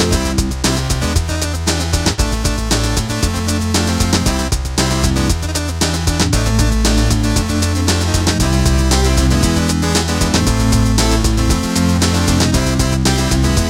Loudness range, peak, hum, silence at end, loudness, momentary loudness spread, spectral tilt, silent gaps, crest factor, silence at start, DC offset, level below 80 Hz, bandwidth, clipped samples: 2 LU; -2 dBFS; none; 0 s; -15 LUFS; 4 LU; -4.5 dB/octave; none; 12 dB; 0 s; under 0.1%; -20 dBFS; 16.5 kHz; under 0.1%